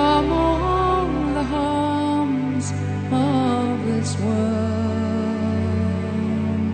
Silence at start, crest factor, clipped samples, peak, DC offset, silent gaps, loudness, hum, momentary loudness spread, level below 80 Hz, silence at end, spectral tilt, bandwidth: 0 s; 16 dB; under 0.1%; -6 dBFS; under 0.1%; none; -21 LUFS; none; 4 LU; -36 dBFS; 0 s; -7 dB/octave; 9.4 kHz